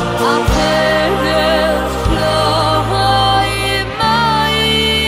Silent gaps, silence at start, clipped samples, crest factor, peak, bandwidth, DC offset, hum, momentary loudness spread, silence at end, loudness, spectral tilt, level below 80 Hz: none; 0 s; under 0.1%; 12 dB; -2 dBFS; 16 kHz; under 0.1%; none; 4 LU; 0 s; -13 LUFS; -4.5 dB/octave; -26 dBFS